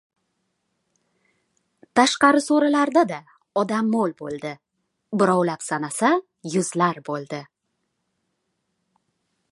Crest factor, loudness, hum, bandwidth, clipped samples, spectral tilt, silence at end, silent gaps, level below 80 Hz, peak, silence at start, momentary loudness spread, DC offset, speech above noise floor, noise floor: 22 dB; -21 LUFS; none; 11.5 kHz; under 0.1%; -4.5 dB/octave; 2.1 s; none; -72 dBFS; -2 dBFS; 1.95 s; 14 LU; under 0.1%; 55 dB; -76 dBFS